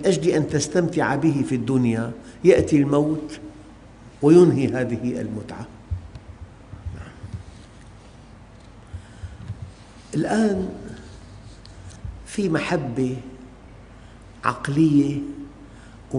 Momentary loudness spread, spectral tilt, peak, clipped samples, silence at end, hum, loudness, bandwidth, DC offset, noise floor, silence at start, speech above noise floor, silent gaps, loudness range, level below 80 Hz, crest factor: 24 LU; -6.5 dB/octave; -2 dBFS; under 0.1%; 0 s; none; -21 LUFS; 10.5 kHz; under 0.1%; -45 dBFS; 0 s; 25 dB; none; 19 LU; -46 dBFS; 20 dB